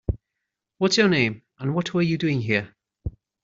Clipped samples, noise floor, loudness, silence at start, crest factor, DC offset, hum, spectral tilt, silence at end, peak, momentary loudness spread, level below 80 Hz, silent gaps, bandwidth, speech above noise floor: under 0.1%; -83 dBFS; -23 LUFS; 0.1 s; 20 dB; under 0.1%; none; -4.5 dB/octave; 0.35 s; -6 dBFS; 19 LU; -42 dBFS; none; 7.8 kHz; 61 dB